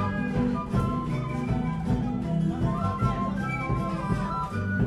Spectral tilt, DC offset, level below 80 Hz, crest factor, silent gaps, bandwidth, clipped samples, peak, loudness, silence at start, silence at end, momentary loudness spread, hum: -8 dB/octave; under 0.1%; -38 dBFS; 16 dB; none; 11.5 kHz; under 0.1%; -12 dBFS; -28 LUFS; 0 s; 0 s; 3 LU; none